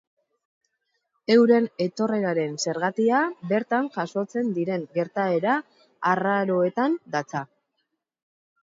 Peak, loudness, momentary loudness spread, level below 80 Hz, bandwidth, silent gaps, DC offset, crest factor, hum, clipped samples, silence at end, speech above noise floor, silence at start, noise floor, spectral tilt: -6 dBFS; -24 LUFS; 8 LU; -76 dBFS; 7.8 kHz; none; under 0.1%; 18 dB; none; under 0.1%; 1.15 s; 54 dB; 1.3 s; -78 dBFS; -5.5 dB/octave